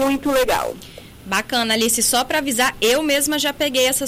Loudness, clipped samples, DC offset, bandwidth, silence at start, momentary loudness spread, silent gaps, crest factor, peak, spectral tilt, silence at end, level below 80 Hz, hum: -18 LUFS; under 0.1%; under 0.1%; 16 kHz; 0 s; 7 LU; none; 14 dB; -4 dBFS; -1.5 dB/octave; 0 s; -44 dBFS; none